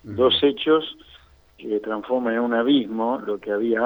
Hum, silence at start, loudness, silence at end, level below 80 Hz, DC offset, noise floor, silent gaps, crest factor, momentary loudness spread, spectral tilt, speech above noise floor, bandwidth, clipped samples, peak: none; 0.05 s; -22 LUFS; 0 s; -58 dBFS; under 0.1%; -51 dBFS; none; 16 dB; 9 LU; -7 dB/octave; 30 dB; 19.5 kHz; under 0.1%; -6 dBFS